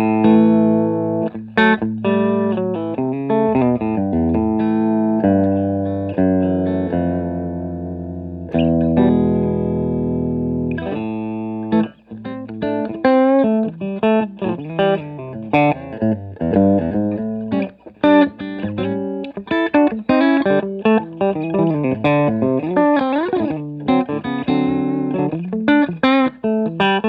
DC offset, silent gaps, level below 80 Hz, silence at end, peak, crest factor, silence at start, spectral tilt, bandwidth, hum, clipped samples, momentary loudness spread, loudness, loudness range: under 0.1%; none; -48 dBFS; 0 s; 0 dBFS; 16 dB; 0 s; -10 dB/octave; 5 kHz; none; under 0.1%; 9 LU; -18 LUFS; 3 LU